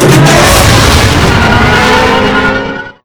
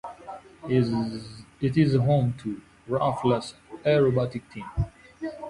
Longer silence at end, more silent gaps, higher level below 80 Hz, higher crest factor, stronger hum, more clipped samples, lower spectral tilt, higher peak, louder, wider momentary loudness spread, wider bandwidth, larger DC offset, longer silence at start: first, 0.15 s vs 0 s; neither; first, -18 dBFS vs -46 dBFS; second, 6 dB vs 18 dB; neither; first, 7% vs under 0.1%; second, -4.5 dB/octave vs -8 dB/octave; first, 0 dBFS vs -8 dBFS; first, -5 LUFS vs -26 LUFS; second, 6 LU vs 18 LU; first, over 20 kHz vs 11 kHz; neither; about the same, 0 s vs 0.05 s